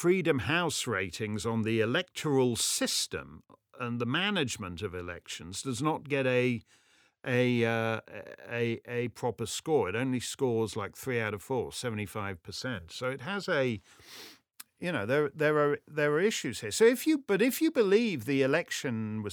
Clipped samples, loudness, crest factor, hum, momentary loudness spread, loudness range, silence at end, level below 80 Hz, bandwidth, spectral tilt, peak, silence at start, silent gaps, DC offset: under 0.1%; -30 LUFS; 20 dB; none; 11 LU; 6 LU; 0 s; -66 dBFS; over 20 kHz; -4.5 dB/octave; -10 dBFS; 0 s; none; under 0.1%